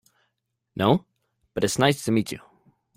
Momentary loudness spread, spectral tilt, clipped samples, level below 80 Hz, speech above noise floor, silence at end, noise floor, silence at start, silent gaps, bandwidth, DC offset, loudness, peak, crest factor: 16 LU; -5 dB/octave; under 0.1%; -58 dBFS; 56 dB; 0.6 s; -78 dBFS; 0.75 s; none; 16 kHz; under 0.1%; -24 LUFS; -6 dBFS; 20 dB